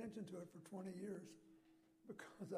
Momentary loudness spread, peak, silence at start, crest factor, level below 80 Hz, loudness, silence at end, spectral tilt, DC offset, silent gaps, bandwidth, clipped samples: 13 LU; -36 dBFS; 0 s; 16 dB; -88 dBFS; -54 LUFS; 0 s; -6.5 dB/octave; under 0.1%; none; 15.5 kHz; under 0.1%